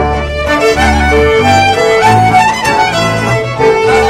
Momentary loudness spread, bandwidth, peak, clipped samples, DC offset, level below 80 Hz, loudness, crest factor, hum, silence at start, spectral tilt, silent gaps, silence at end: 5 LU; 16 kHz; 0 dBFS; under 0.1%; under 0.1%; -22 dBFS; -9 LUFS; 8 dB; none; 0 s; -4.5 dB/octave; none; 0 s